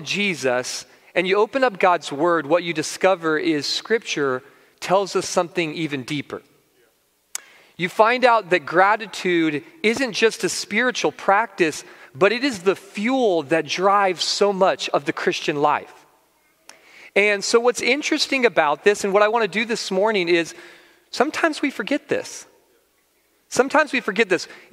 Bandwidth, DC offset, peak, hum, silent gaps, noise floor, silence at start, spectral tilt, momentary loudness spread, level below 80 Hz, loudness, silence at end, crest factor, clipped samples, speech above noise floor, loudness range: 16 kHz; under 0.1%; 0 dBFS; none; none; -63 dBFS; 0 s; -3.5 dB/octave; 9 LU; -70 dBFS; -20 LUFS; 0.15 s; 20 dB; under 0.1%; 43 dB; 5 LU